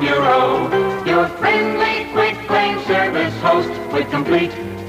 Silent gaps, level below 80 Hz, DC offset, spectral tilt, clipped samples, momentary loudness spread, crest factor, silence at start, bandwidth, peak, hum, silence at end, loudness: none; -48 dBFS; under 0.1%; -6 dB/octave; under 0.1%; 5 LU; 14 dB; 0 s; 15.5 kHz; -4 dBFS; none; 0 s; -17 LUFS